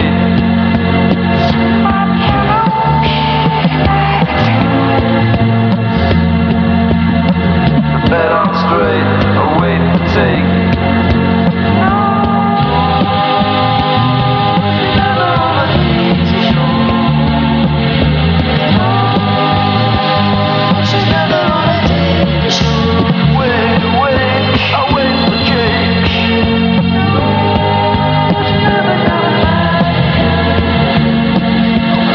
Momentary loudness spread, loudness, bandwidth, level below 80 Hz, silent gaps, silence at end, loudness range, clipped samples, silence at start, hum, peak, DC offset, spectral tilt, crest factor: 1 LU; -11 LUFS; 7 kHz; -26 dBFS; none; 0 s; 0 LU; under 0.1%; 0 s; none; 0 dBFS; under 0.1%; -7.5 dB/octave; 10 dB